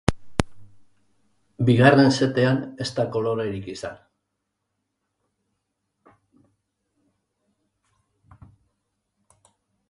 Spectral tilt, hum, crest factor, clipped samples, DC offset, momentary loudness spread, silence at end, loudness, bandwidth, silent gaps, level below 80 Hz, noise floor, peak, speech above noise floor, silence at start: -6.5 dB/octave; none; 26 dB; under 0.1%; under 0.1%; 19 LU; 5.95 s; -21 LUFS; 11.5 kHz; none; -48 dBFS; -79 dBFS; 0 dBFS; 59 dB; 0.1 s